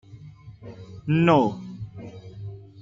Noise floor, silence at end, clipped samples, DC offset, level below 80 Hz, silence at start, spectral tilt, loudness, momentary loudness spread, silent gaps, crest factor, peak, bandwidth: -45 dBFS; 0.2 s; under 0.1%; under 0.1%; -56 dBFS; 0.15 s; -8.5 dB/octave; -21 LUFS; 25 LU; none; 20 dB; -6 dBFS; 7.6 kHz